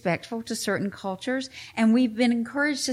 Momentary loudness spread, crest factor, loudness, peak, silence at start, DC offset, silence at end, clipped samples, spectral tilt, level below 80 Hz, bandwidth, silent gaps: 10 LU; 14 dB; -26 LUFS; -10 dBFS; 0.05 s; under 0.1%; 0 s; under 0.1%; -4.5 dB/octave; -68 dBFS; 14.5 kHz; none